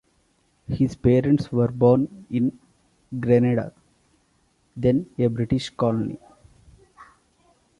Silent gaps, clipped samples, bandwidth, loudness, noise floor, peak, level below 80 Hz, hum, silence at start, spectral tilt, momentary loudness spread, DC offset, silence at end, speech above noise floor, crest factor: none; under 0.1%; 10.5 kHz; -22 LUFS; -65 dBFS; -4 dBFS; -48 dBFS; none; 0.7 s; -8.5 dB/octave; 15 LU; under 0.1%; 0.75 s; 44 dB; 20 dB